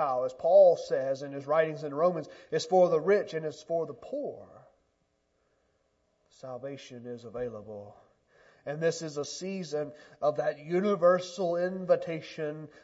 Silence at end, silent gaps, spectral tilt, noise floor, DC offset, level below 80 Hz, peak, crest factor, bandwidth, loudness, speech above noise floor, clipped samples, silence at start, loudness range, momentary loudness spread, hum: 0.15 s; none; -5.5 dB/octave; -75 dBFS; under 0.1%; -74 dBFS; -10 dBFS; 20 dB; 8 kHz; -29 LUFS; 46 dB; under 0.1%; 0 s; 17 LU; 18 LU; none